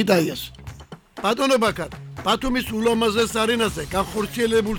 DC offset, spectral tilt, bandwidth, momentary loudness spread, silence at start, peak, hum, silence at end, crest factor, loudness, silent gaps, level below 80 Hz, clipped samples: under 0.1%; -4.5 dB/octave; 19.5 kHz; 15 LU; 0 s; -4 dBFS; none; 0 s; 18 dB; -22 LUFS; none; -42 dBFS; under 0.1%